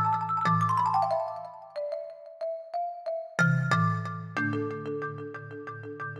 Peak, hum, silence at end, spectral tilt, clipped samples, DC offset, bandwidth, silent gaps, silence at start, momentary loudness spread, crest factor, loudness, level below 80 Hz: -10 dBFS; none; 0 s; -7 dB/octave; under 0.1%; under 0.1%; 11 kHz; none; 0 s; 15 LU; 18 dB; -29 LUFS; -78 dBFS